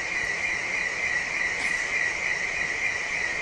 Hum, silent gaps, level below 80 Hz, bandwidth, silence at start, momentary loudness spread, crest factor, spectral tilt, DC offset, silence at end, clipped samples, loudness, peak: none; none; -52 dBFS; 11.5 kHz; 0 s; 2 LU; 14 dB; -1 dB/octave; under 0.1%; 0 s; under 0.1%; -25 LUFS; -14 dBFS